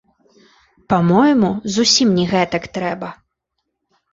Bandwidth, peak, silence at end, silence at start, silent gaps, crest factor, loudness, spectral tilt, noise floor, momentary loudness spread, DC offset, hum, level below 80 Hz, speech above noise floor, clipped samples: 8 kHz; -2 dBFS; 1 s; 0.9 s; none; 16 dB; -16 LUFS; -4.5 dB/octave; -75 dBFS; 11 LU; under 0.1%; none; -52 dBFS; 60 dB; under 0.1%